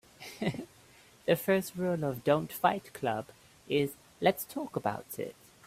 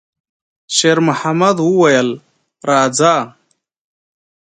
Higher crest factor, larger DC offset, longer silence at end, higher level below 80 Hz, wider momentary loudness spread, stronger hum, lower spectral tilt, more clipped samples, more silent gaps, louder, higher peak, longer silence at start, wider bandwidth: first, 22 dB vs 16 dB; neither; second, 0.35 s vs 1.2 s; about the same, -68 dBFS vs -64 dBFS; about the same, 12 LU vs 11 LU; neither; first, -5.5 dB/octave vs -4 dB/octave; neither; neither; second, -32 LUFS vs -13 LUFS; second, -12 dBFS vs 0 dBFS; second, 0.2 s vs 0.7 s; first, 16 kHz vs 9.6 kHz